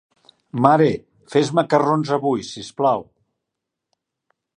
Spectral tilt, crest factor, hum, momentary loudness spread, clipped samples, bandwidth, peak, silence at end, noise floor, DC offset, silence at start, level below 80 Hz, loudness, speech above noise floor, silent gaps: -6.5 dB/octave; 20 dB; none; 12 LU; under 0.1%; 10 kHz; 0 dBFS; 1.55 s; -82 dBFS; under 0.1%; 0.55 s; -62 dBFS; -19 LUFS; 64 dB; none